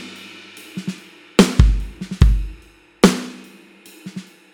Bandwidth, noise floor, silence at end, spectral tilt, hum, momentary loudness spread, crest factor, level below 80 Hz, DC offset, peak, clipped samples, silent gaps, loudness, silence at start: 17 kHz; -46 dBFS; 0.3 s; -5.5 dB/octave; none; 22 LU; 20 dB; -22 dBFS; under 0.1%; 0 dBFS; under 0.1%; none; -18 LUFS; 0 s